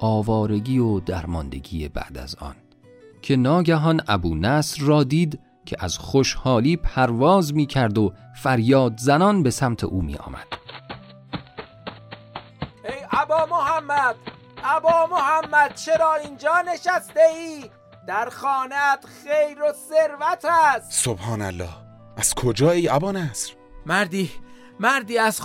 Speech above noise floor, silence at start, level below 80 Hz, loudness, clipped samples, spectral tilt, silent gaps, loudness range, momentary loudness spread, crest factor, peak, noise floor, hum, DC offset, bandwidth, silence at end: 29 dB; 0 s; -42 dBFS; -21 LUFS; under 0.1%; -5 dB/octave; none; 6 LU; 18 LU; 18 dB; -4 dBFS; -49 dBFS; none; under 0.1%; 16.5 kHz; 0 s